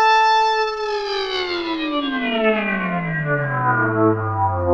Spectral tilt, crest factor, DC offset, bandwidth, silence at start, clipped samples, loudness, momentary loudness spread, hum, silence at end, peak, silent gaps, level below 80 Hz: -6 dB/octave; 14 dB; under 0.1%; 8 kHz; 0 s; under 0.1%; -19 LUFS; 7 LU; none; 0 s; -4 dBFS; none; -50 dBFS